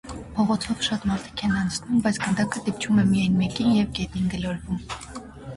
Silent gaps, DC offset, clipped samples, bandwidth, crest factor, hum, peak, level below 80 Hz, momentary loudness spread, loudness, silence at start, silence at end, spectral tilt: none; under 0.1%; under 0.1%; 11.5 kHz; 14 dB; none; -10 dBFS; -44 dBFS; 10 LU; -24 LUFS; 0.05 s; 0 s; -5.5 dB/octave